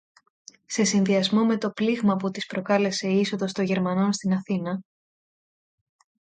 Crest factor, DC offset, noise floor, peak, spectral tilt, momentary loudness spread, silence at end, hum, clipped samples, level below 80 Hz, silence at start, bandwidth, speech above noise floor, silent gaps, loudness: 16 dB; under 0.1%; under -90 dBFS; -8 dBFS; -5 dB/octave; 7 LU; 1.5 s; none; under 0.1%; -70 dBFS; 0.7 s; 9.2 kHz; over 66 dB; none; -24 LUFS